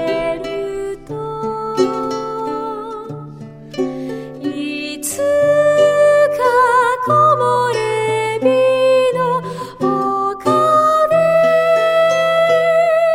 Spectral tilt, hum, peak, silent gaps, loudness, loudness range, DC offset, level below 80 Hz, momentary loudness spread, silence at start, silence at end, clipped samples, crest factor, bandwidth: -4.5 dB/octave; none; -2 dBFS; none; -15 LUFS; 9 LU; under 0.1%; -50 dBFS; 13 LU; 0 s; 0 s; under 0.1%; 14 dB; 16 kHz